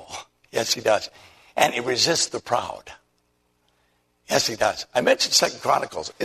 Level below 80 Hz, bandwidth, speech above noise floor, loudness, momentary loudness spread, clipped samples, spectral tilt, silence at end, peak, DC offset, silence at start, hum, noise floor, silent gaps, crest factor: -60 dBFS; 13.5 kHz; 45 dB; -22 LUFS; 15 LU; under 0.1%; -1.5 dB/octave; 0 s; -2 dBFS; under 0.1%; 0 s; 60 Hz at -60 dBFS; -68 dBFS; none; 24 dB